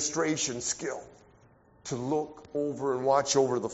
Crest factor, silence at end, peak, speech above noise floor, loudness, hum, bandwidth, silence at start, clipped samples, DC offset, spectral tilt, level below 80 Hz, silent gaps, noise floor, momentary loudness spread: 20 dB; 0 s; -12 dBFS; 31 dB; -29 LUFS; none; 8 kHz; 0 s; under 0.1%; under 0.1%; -4 dB/octave; -64 dBFS; none; -60 dBFS; 12 LU